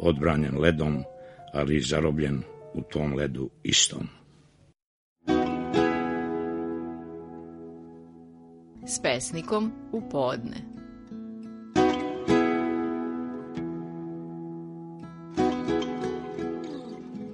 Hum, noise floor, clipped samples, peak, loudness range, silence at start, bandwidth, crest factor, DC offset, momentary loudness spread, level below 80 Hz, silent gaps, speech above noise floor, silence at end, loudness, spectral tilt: none; -59 dBFS; under 0.1%; -6 dBFS; 5 LU; 0 s; 10.5 kHz; 24 dB; under 0.1%; 18 LU; -48 dBFS; 4.84-5.16 s; 32 dB; 0 s; -28 LUFS; -4.5 dB/octave